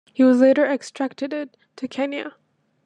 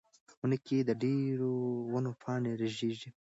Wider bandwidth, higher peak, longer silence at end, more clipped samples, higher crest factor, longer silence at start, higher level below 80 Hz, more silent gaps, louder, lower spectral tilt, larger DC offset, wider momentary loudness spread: first, 9.6 kHz vs 8 kHz; first, -6 dBFS vs -18 dBFS; first, 0.55 s vs 0.15 s; neither; about the same, 16 dB vs 14 dB; second, 0.2 s vs 0.45 s; about the same, -80 dBFS vs -76 dBFS; neither; first, -20 LUFS vs -34 LUFS; second, -4.5 dB/octave vs -7.5 dB/octave; neither; first, 19 LU vs 5 LU